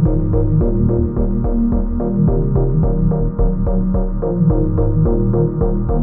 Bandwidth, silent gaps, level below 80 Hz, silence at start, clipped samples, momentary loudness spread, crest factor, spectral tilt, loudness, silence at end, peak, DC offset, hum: 1.9 kHz; none; -18 dBFS; 0 s; under 0.1%; 3 LU; 12 dB; -16.5 dB/octave; -17 LUFS; 0 s; -4 dBFS; under 0.1%; none